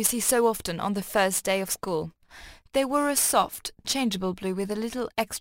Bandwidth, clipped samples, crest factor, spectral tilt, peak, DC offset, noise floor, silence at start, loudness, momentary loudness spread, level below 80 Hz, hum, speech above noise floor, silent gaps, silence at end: 16 kHz; under 0.1%; 18 dB; -3 dB/octave; -8 dBFS; under 0.1%; -48 dBFS; 0 s; -26 LUFS; 8 LU; -56 dBFS; none; 22 dB; none; 0 s